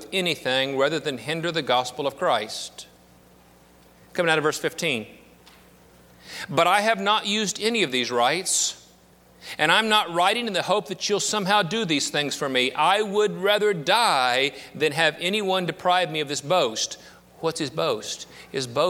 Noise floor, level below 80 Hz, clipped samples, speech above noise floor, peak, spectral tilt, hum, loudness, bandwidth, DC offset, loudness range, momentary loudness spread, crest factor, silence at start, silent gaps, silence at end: -54 dBFS; -66 dBFS; under 0.1%; 31 dB; -2 dBFS; -2.5 dB/octave; none; -23 LUFS; 18.5 kHz; under 0.1%; 6 LU; 11 LU; 22 dB; 0 s; none; 0 s